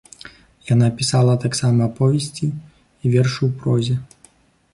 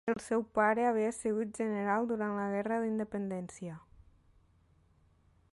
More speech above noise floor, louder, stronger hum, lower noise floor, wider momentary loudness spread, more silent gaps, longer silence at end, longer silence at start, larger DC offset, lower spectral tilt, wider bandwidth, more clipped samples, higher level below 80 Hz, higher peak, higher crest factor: about the same, 36 dB vs 34 dB; first, -19 LUFS vs -33 LUFS; neither; second, -54 dBFS vs -67 dBFS; about the same, 12 LU vs 12 LU; neither; second, 0.7 s vs 1.75 s; first, 0.25 s vs 0.05 s; neither; about the same, -6 dB/octave vs -6.5 dB/octave; about the same, 11.5 kHz vs 11.5 kHz; neither; first, -52 dBFS vs -68 dBFS; first, -4 dBFS vs -16 dBFS; about the same, 14 dB vs 18 dB